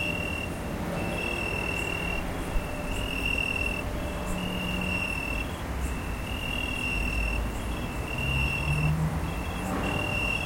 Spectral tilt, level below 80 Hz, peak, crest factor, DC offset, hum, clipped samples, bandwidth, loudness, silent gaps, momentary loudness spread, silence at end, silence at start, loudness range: -5 dB/octave; -36 dBFS; -14 dBFS; 16 dB; under 0.1%; none; under 0.1%; 17 kHz; -30 LUFS; none; 6 LU; 0 s; 0 s; 2 LU